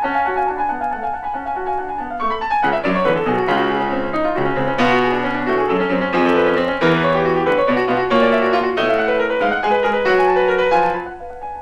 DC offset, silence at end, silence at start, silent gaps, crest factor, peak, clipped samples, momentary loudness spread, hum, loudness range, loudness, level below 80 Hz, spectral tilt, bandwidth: under 0.1%; 0 s; 0 s; none; 14 dB; -4 dBFS; under 0.1%; 8 LU; none; 3 LU; -17 LUFS; -44 dBFS; -6.5 dB/octave; 10 kHz